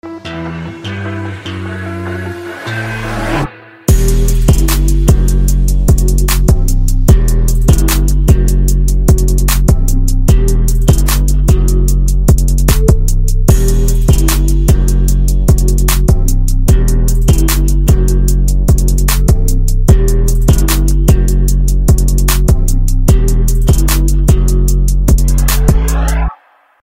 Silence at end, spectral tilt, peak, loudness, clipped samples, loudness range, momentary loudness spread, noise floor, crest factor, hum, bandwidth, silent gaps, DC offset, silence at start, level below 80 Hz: 0.5 s; -5.5 dB/octave; 0 dBFS; -12 LUFS; 0.4%; 2 LU; 9 LU; -40 dBFS; 8 dB; none; 16.5 kHz; none; under 0.1%; 0.05 s; -10 dBFS